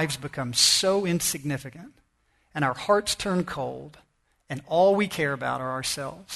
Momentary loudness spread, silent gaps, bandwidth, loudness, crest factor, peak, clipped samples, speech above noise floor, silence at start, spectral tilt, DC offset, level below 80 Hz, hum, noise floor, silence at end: 15 LU; none; 12.5 kHz; -25 LUFS; 20 dB; -6 dBFS; under 0.1%; 42 dB; 0 s; -3 dB/octave; under 0.1%; -58 dBFS; none; -68 dBFS; 0 s